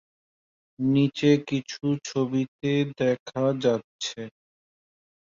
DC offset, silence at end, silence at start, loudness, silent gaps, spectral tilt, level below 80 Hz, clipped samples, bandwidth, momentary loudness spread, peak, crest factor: under 0.1%; 1.05 s; 0.8 s; -26 LUFS; 2.48-2.59 s, 3.20-3.26 s, 3.84-3.99 s; -6 dB/octave; -66 dBFS; under 0.1%; 7.6 kHz; 11 LU; -8 dBFS; 18 dB